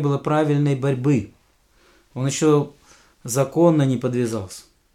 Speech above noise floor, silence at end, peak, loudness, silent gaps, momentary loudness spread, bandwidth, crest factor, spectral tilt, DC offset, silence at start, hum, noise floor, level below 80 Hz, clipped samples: 39 dB; 0.35 s; -4 dBFS; -20 LUFS; none; 20 LU; 14.5 kHz; 16 dB; -6.5 dB/octave; under 0.1%; 0 s; none; -59 dBFS; -58 dBFS; under 0.1%